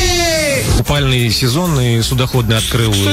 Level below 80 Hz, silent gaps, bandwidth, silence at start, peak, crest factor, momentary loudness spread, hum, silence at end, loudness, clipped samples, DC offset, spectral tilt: -24 dBFS; none; 16.5 kHz; 0 s; -2 dBFS; 10 dB; 2 LU; none; 0 s; -13 LUFS; under 0.1%; under 0.1%; -4.5 dB/octave